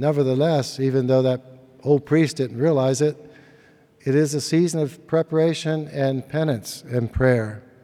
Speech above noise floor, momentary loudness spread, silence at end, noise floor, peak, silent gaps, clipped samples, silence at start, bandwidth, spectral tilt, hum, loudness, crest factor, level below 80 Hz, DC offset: 33 dB; 7 LU; 0.25 s; -53 dBFS; -4 dBFS; none; under 0.1%; 0 s; 15 kHz; -6.5 dB/octave; none; -22 LUFS; 16 dB; -46 dBFS; under 0.1%